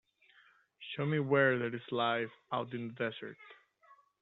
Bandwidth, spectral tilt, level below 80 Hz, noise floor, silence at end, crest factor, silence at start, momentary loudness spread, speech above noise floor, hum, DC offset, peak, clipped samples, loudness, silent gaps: 4.2 kHz; -4 dB/octave; -80 dBFS; -66 dBFS; 0.25 s; 22 dB; 0.8 s; 19 LU; 32 dB; none; under 0.1%; -14 dBFS; under 0.1%; -34 LUFS; none